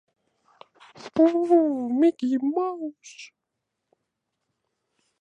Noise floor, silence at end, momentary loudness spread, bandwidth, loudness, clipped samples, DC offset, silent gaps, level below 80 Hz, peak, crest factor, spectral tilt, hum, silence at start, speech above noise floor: -82 dBFS; 1.95 s; 23 LU; 8.2 kHz; -23 LUFS; under 0.1%; under 0.1%; none; -76 dBFS; -8 dBFS; 18 dB; -6 dB/octave; none; 1 s; 60 dB